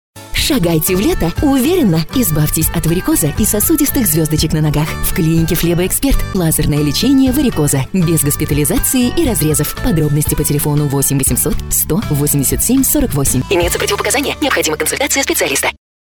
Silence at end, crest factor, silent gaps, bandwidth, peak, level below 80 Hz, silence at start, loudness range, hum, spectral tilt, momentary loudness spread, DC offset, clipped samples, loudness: 0.25 s; 12 dB; none; over 20 kHz; -2 dBFS; -26 dBFS; 0.15 s; 1 LU; none; -4.5 dB/octave; 3 LU; 0.7%; under 0.1%; -13 LUFS